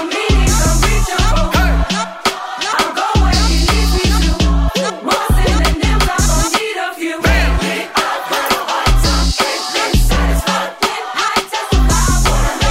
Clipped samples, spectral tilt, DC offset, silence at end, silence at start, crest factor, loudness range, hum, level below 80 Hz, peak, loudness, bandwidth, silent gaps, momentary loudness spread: under 0.1%; -4 dB/octave; under 0.1%; 0 s; 0 s; 14 dB; 1 LU; none; -16 dBFS; 0 dBFS; -14 LUFS; 16.5 kHz; none; 4 LU